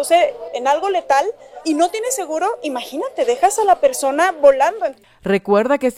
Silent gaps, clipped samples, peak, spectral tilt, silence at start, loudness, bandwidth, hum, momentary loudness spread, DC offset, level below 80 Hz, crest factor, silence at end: none; under 0.1%; 0 dBFS; -3.5 dB/octave; 0 s; -17 LUFS; 16 kHz; none; 12 LU; under 0.1%; -56 dBFS; 16 dB; 0.05 s